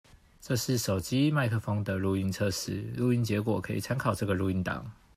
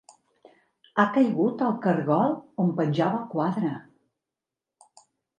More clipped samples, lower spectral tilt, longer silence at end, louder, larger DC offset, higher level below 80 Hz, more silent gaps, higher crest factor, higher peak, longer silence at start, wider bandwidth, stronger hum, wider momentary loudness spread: neither; second, -5.5 dB/octave vs -8.5 dB/octave; second, 0.25 s vs 1.55 s; second, -30 LUFS vs -25 LUFS; neither; first, -56 dBFS vs -76 dBFS; neither; second, 16 dB vs 22 dB; second, -12 dBFS vs -6 dBFS; second, 0.15 s vs 0.95 s; first, 15.5 kHz vs 9.8 kHz; neither; about the same, 6 LU vs 7 LU